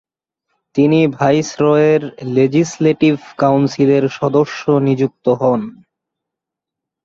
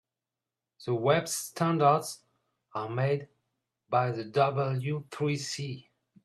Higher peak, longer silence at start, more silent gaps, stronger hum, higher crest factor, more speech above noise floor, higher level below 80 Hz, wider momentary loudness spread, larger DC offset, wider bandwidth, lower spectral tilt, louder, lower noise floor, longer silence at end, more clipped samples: first, -2 dBFS vs -10 dBFS; about the same, 0.75 s vs 0.8 s; neither; neither; second, 14 dB vs 20 dB; first, 69 dB vs 61 dB; first, -56 dBFS vs -74 dBFS; second, 4 LU vs 15 LU; neither; second, 7.8 kHz vs 14 kHz; first, -7 dB/octave vs -5.5 dB/octave; first, -15 LUFS vs -29 LUFS; second, -83 dBFS vs -90 dBFS; first, 1.35 s vs 0.45 s; neither